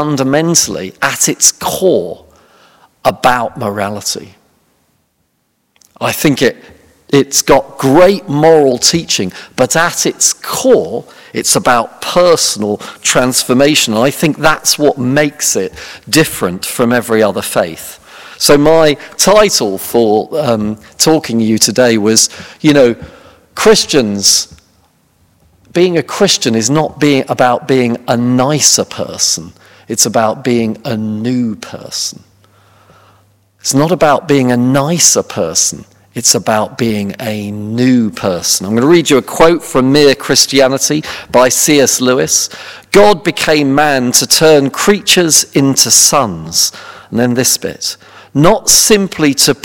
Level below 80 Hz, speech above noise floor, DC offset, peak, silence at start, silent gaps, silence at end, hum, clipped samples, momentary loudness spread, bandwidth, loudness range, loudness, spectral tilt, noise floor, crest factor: -44 dBFS; 51 dB; under 0.1%; 0 dBFS; 0 s; none; 0.1 s; none; 1%; 10 LU; over 20 kHz; 7 LU; -10 LUFS; -3 dB/octave; -62 dBFS; 12 dB